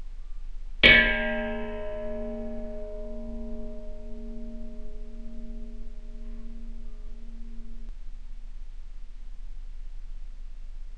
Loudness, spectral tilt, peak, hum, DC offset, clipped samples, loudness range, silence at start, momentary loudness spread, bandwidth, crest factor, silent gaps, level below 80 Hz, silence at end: -23 LUFS; -5 dB/octave; -2 dBFS; none; under 0.1%; under 0.1%; 23 LU; 0 s; 22 LU; 6.2 kHz; 26 dB; none; -36 dBFS; 0 s